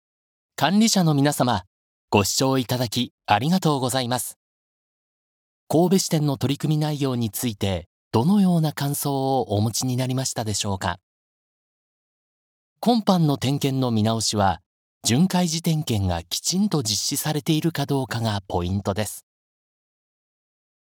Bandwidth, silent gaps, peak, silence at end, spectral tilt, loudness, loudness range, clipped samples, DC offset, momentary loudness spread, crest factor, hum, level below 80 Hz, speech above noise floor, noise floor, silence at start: 19.5 kHz; 1.67-2.08 s, 3.11-3.18 s, 4.36-5.67 s, 7.86-8.11 s, 11.03-12.76 s, 14.66-15.01 s; -4 dBFS; 1.6 s; -5 dB/octave; -22 LUFS; 4 LU; under 0.1%; under 0.1%; 8 LU; 20 dB; none; -54 dBFS; over 68 dB; under -90 dBFS; 0.6 s